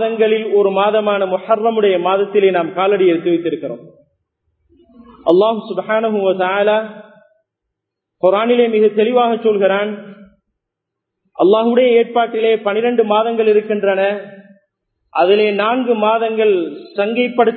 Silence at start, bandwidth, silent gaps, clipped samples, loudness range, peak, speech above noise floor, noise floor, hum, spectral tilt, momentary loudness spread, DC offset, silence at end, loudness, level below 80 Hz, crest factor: 0 s; 4.5 kHz; none; under 0.1%; 3 LU; 0 dBFS; 65 dB; -79 dBFS; none; -9 dB/octave; 8 LU; under 0.1%; 0 s; -15 LUFS; -68 dBFS; 16 dB